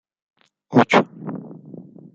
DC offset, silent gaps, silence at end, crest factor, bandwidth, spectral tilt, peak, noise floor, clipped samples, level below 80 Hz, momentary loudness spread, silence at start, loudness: under 0.1%; none; 0.6 s; 20 dB; 7.6 kHz; -6.5 dB/octave; -2 dBFS; -41 dBFS; under 0.1%; -64 dBFS; 25 LU; 0.7 s; -18 LUFS